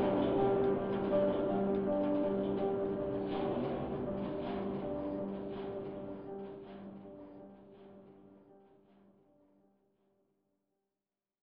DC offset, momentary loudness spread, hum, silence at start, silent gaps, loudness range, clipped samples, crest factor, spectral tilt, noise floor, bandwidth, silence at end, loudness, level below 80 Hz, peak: under 0.1%; 20 LU; none; 0 s; none; 20 LU; under 0.1%; 16 dB; -7 dB/octave; under -90 dBFS; 5 kHz; 2.85 s; -35 LUFS; -62 dBFS; -20 dBFS